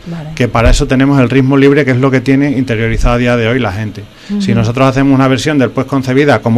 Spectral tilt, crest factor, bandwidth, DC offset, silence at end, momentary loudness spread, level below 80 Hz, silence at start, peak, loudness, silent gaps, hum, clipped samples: -6.5 dB/octave; 10 dB; 12.5 kHz; under 0.1%; 0 s; 9 LU; -22 dBFS; 0.05 s; 0 dBFS; -10 LUFS; none; none; 0.3%